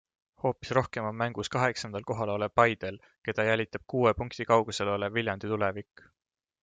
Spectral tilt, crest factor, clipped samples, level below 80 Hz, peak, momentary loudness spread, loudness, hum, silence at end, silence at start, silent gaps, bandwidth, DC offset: -5.5 dB/octave; 22 dB; under 0.1%; -58 dBFS; -8 dBFS; 9 LU; -29 LUFS; none; 0.8 s; 0.45 s; 3.18-3.22 s; 9.4 kHz; under 0.1%